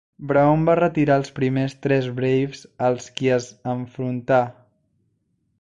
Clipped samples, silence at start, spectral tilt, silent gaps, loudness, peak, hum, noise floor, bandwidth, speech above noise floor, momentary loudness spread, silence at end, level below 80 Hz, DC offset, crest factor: under 0.1%; 0.2 s; -7 dB/octave; none; -21 LUFS; -6 dBFS; none; -69 dBFS; 9.2 kHz; 49 dB; 10 LU; 1.1 s; -54 dBFS; under 0.1%; 16 dB